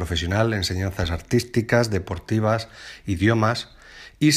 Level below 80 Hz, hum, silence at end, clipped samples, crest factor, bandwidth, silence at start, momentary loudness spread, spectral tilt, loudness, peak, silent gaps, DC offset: -40 dBFS; none; 0 s; under 0.1%; 18 dB; 15 kHz; 0 s; 15 LU; -5.5 dB/octave; -23 LUFS; -4 dBFS; none; under 0.1%